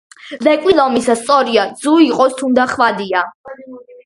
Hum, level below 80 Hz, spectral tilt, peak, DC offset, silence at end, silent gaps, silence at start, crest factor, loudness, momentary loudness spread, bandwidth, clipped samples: none; -54 dBFS; -4 dB/octave; 0 dBFS; under 0.1%; 0.25 s; 3.35-3.44 s; 0.25 s; 14 dB; -13 LUFS; 11 LU; 11.5 kHz; under 0.1%